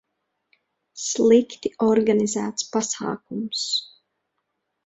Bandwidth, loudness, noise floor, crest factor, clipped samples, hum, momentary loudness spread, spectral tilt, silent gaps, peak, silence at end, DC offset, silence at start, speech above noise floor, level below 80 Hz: 8.2 kHz; -22 LUFS; -77 dBFS; 18 dB; under 0.1%; none; 12 LU; -3.5 dB/octave; none; -6 dBFS; 1 s; under 0.1%; 0.95 s; 56 dB; -66 dBFS